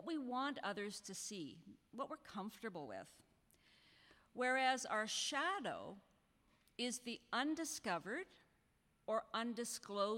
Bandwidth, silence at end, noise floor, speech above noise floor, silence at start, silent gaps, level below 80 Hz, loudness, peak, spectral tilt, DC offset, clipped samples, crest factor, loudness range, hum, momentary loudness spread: 16.5 kHz; 0 s; -78 dBFS; 35 dB; 0 s; none; -82 dBFS; -43 LUFS; -24 dBFS; -2.5 dB/octave; under 0.1%; under 0.1%; 20 dB; 8 LU; none; 17 LU